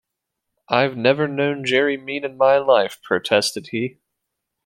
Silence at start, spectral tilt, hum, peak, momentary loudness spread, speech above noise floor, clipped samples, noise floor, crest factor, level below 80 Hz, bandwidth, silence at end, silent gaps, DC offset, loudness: 0.7 s; -4.5 dB/octave; none; -2 dBFS; 10 LU; 61 dB; under 0.1%; -80 dBFS; 20 dB; -66 dBFS; 16.5 kHz; 0.75 s; none; under 0.1%; -19 LUFS